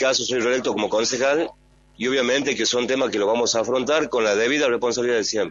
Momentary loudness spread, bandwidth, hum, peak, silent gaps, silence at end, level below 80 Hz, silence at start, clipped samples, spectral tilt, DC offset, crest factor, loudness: 3 LU; 7.6 kHz; none; -6 dBFS; none; 0 s; -58 dBFS; 0 s; under 0.1%; -2.5 dB/octave; under 0.1%; 16 dB; -21 LUFS